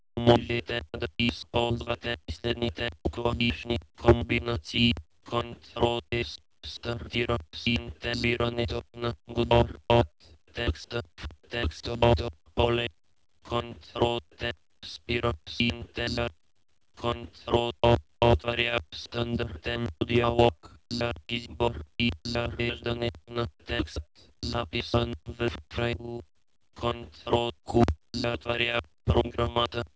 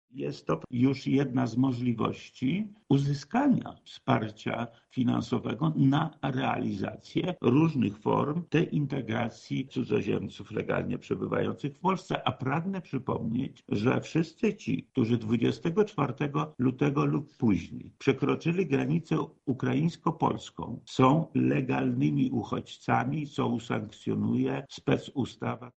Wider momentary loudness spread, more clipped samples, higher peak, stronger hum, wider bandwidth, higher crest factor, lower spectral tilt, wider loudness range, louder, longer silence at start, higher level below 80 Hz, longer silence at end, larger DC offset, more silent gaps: first, 11 LU vs 8 LU; neither; first, -4 dBFS vs -8 dBFS; neither; about the same, 8 kHz vs 8.2 kHz; about the same, 24 dB vs 20 dB; about the same, -6.5 dB/octave vs -7.5 dB/octave; about the same, 4 LU vs 3 LU; about the same, -29 LUFS vs -29 LUFS; about the same, 0.15 s vs 0.15 s; first, -40 dBFS vs -62 dBFS; about the same, 0.1 s vs 0.05 s; neither; neither